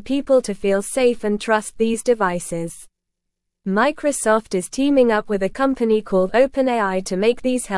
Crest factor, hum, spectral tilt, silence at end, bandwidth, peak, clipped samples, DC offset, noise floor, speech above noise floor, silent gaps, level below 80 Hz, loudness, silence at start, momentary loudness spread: 16 dB; none; -4.5 dB/octave; 0 s; 12 kHz; -4 dBFS; under 0.1%; under 0.1%; -78 dBFS; 59 dB; none; -48 dBFS; -19 LUFS; 0 s; 7 LU